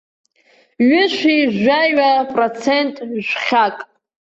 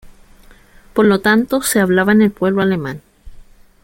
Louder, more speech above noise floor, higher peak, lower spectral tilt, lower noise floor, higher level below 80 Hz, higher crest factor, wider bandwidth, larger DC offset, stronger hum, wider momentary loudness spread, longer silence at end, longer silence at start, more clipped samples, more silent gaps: about the same, -15 LUFS vs -14 LUFS; first, 40 dB vs 31 dB; second, -4 dBFS vs 0 dBFS; about the same, -5 dB/octave vs -5 dB/octave; first, -55 dBFS vs -44 dBFS; second, -62 dBFS vs -44 dBFS; about the same, 14 dB vs 16 dB; second, 8 kHz vs 17 kHz; neither; neither; second, 7 LU vs 11 LU; about the same, 0.45 s vs 0.5 s; first, 0.8 s vs 0.05 s; neither; neither